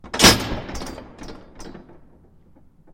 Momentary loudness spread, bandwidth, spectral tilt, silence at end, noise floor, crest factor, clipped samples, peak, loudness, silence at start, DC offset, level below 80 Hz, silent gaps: 28 LU; 16.5 kHz; -2.5 dB/octave; 1.15 s; -51 dBFS; 24 dB; under 0.1%; 0 dBFS; -16 LUFS; 0.05 s; under 0.1%; -38 dBFS; none